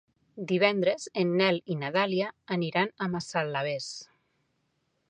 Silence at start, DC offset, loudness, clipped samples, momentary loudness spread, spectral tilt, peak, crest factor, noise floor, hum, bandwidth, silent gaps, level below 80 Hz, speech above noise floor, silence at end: 0.35 s; under 0.1%; -28 LUFS; under 0.1%; 9 LU; -5 dB/octave; -8 dBFS; 22 dB; -75 dBFS; none; 10 kHz; none; -74 dBFS; 47 dB; 1.05 s